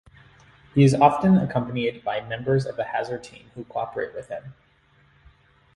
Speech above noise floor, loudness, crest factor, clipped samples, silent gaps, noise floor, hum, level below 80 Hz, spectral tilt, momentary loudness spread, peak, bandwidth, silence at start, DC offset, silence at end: 37 dB; -23 LUFS; 22 dB; under 0.1%; none; -60 dBFS; none; -56 dBFS; -7.5 dB/octave; 18 LU; -2 dBFS; 11.5 kHz; 0.75 s; under 0.1%; 1.25 s